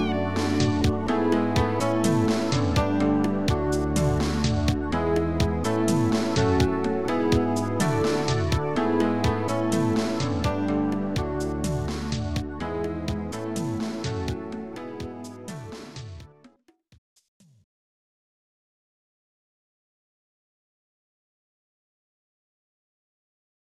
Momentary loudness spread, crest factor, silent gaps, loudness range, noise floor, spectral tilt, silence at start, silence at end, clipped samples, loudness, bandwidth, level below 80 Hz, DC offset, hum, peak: 13 LU; 16 dB; 16.98-17.16 s, 17.28-17.40 s; 13 LU; -60 dBFS; -6 dB/octave; 0 s; 6 s; under 0.1%; -25 LUFS; 15.5 kHz; -40 dBFS; 1%; none; -10 dBFS